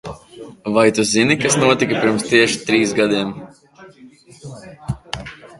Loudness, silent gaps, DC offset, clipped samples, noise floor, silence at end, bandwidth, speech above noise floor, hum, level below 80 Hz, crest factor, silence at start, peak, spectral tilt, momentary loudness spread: -16 LUFS; none; under 0.1%; under 0.1%; -45 dBFS; 0.15 s; 11.5 kHz; 29 dB; none; -48 dBFS; 18 dB; 0.05 s; 0 dBFS; -4 dB/octave; 21 LU